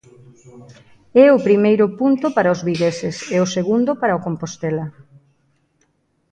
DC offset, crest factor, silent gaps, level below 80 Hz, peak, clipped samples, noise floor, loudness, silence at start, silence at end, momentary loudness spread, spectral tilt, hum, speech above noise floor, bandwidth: under 0.1%; 18 dB; none; -60 dBFS; 0 dBFS; under 0.1%; -64 dBFS; -17 LUFS; 0.55 s; 1.4 s; 13 LU; -6 dB/octave; none; 47 dB; 9.4 kHz